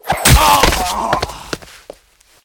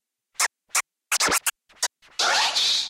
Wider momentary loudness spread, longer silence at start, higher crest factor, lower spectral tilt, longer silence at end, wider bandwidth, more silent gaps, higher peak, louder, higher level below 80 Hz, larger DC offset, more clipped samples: first, 18 LU vs 9 LU; second, 0.05 s vs 0.4 s; about the same, 16 dB vs 16 dB; first, -3 dB/octave vs 1.5 dB/octave; first, 0.85 s vs 0 s; first, 19 kHz vs 17 kHz; neither; first, 0 dBFS vs -8 dBFS; first, -12 LUFS vs -23 LUFS; first, -22 dBFS vs -60 dBFS; neither; neither